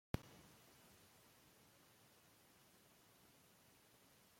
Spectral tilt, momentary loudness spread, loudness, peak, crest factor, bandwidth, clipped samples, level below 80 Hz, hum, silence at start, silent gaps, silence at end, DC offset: -5.5 dB/octave; 6 LU; -63 LUFS; -26 dBFS; 34 dB; 16.5 kHz; under 0.1%; -72 dBFS; none; 0.15 s; none; 0 s; under 0.1%